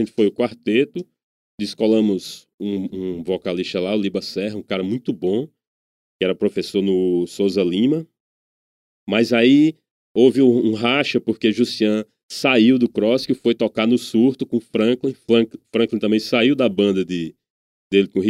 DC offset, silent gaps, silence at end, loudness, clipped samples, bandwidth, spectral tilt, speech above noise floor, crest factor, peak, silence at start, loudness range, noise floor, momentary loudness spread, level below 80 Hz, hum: under 0.1%; 1.23-1.58 s, 2.54-2.58 s, 5.67-6.20 s, 8.20-9.07 s, 9.91-10.15 s, 12.23-12.29 s, 17.50-17.90 s; 0 s; -19 LUFS; under 0.1%; 13.5 kHz; -6 dB/octave; over 72 dB; 18 dB; -2 dBFS; 0 s; 6 LU; under -90 dBFS; 10 LU; -64 dBFS; none